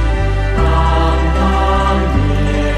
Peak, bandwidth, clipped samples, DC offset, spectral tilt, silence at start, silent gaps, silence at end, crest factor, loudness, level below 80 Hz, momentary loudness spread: -2 dBFS; 9.2 kHz; under 0.1%; under 0.1%; -7 dB/octave; 0 s; none; 0 s; 10 dB; -14 LUFS; -16 dBFS; 3 LU